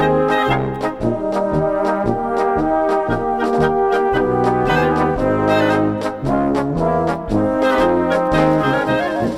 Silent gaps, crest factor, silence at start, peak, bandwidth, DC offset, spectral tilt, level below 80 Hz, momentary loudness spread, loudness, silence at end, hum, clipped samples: none; 16 dB; 0 s; -2 dBFS; 13.5 kHz; under 0.1%; -7 dB/octave; -36 dBFS; 4 LU; -17 LUFS; 0 s; none; under 0.1%